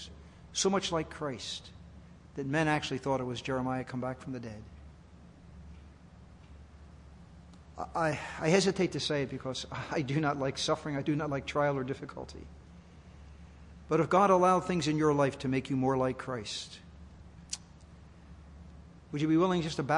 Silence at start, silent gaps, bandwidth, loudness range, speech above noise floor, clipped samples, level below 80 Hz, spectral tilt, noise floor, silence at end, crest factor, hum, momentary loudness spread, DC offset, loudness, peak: 0 s; none; 11 kHz; 12 LU; 23 dB; under 0.1%; -56 dBFS; -5 dB/octave; -54 dBFS; 0 s; 22 dB; none; 25 LU; under 0.1%; -31 LUFS; -12 dBFS